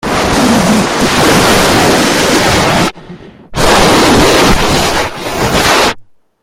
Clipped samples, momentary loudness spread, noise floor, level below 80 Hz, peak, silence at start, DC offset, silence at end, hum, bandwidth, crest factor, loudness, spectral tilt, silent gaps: under 0.1%; 7 LU; -33 dBFS; -24 dBFS; 0 dBFS; 0.05 s; under 0.1%; 0.4 s; none; 17 kHz; 10 dB; -8 LUFS; -3.5 dB/octave; none